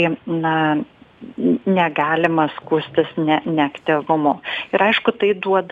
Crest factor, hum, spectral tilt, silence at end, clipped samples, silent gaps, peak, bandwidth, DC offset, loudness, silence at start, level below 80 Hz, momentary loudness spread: 16 dB; none; -7.5 dB/octave; 0.05 s; under 0.1%; none; -2 dBFS; 7.2 kHz; under 0.1%; -19 LUFS; 0 s; -64 dBFS; 5 LU